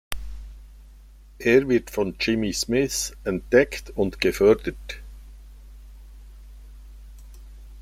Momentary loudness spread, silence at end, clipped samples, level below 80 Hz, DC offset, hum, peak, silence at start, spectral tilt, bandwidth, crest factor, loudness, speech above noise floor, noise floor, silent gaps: 19 LU; 0 s; under 0.1%; -42 dBFS; under 0.1%; none; -2 dBFS; 0.1 s; -4.5 dB/octave; 16 kHz; 22 dB; -22 LUFS; 25 dB; -47 dBFS; none